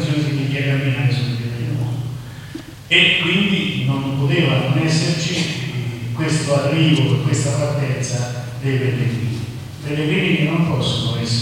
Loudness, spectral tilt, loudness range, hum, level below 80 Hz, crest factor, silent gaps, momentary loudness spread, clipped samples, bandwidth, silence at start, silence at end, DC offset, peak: -18 LUFS; -5 dB/octave; 4 LU; none; -48 dBFS; 18 dB; none; 10 LU; under 0.1%; 15.5 kHz; 0 s; 0 s; under 0.1%; 0 dBFS